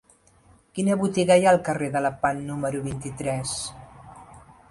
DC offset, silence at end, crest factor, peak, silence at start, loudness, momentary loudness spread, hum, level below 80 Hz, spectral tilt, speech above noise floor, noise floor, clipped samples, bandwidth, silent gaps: under 0.1%; 0.3 s; 18 dB; -6 dBFS; 0.75 s; -24 LUFS; 13 LU; none; -54 dBFS; -5 dB/octave; 34 dB; -57 dBFS; under 0.1%; 11.5 kHz; none